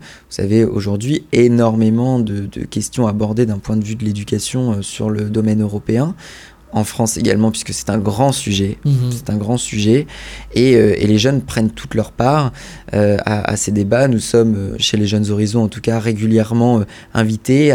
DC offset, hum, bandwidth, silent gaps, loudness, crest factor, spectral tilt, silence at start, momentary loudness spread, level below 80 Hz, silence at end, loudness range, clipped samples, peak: under 0.1%; none; 16.5 kHz; none; -16 LUFS; 14 dB; -6 dB/octave; 0 s; 8 LU; -40 dBFS; 0 s; 3 LU; under 0.1%; 0 dBFS